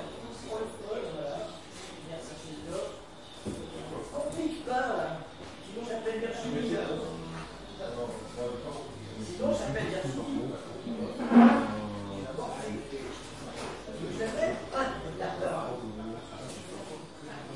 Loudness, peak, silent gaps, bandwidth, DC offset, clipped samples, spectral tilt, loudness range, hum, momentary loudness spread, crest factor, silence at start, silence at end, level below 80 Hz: -33 LUFS; -8 dBFS; none; 11.5 kHz; 0.2%; under 0.1%; -5.5 dB/octave; 11 LU; none; 11 LU; 24 dB; 0 s; 0 s; -56 dBFS